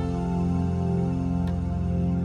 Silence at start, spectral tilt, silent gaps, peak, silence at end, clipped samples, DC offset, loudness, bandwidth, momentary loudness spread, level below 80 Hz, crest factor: 0 s; -9.5 dB/octave; none; -14 dBFS; 0 s; under 0.1%; under 0.1%; -26 LUFS; 7.2 kHz; 2 LU; -36 dBFS; 10 dB